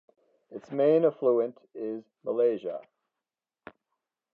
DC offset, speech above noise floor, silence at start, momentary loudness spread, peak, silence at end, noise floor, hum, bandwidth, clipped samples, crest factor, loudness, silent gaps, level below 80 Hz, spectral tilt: under 0.1%; 63 dB; 0.5 s; 17 LU; -12 dBFS; 1.55 s; -90 dBFS; none; 4.3 kHz; under 0.1%; 18 dB; -28 LUFS; none; -84 dBFS; -9 dB/octave